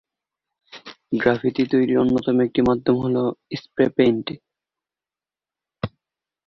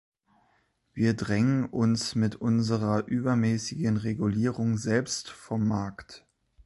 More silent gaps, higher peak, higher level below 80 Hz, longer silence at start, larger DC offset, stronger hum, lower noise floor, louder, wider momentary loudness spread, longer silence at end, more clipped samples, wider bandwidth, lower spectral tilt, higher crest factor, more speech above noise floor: neither; first, -4 dBFS vs -12 dBFS; about the same, -52 dBFS vs -56 dBFS; second, 0.75 s vs 0.95 s; neither; neither; first, under -90 dBFS vs -70 dBFS; first, -20 LUFS vs -28 LUFS; first, 15 LU vs 7 LU; first, 0.6 s vs 0.45 s; neither; second, 6.2 kHz vs 11.5 kHz; first, -8 dB/octave vs -6 dB/octave; about the same, 20 dB vs 16 dB; first, over 70 dB vs 43 dB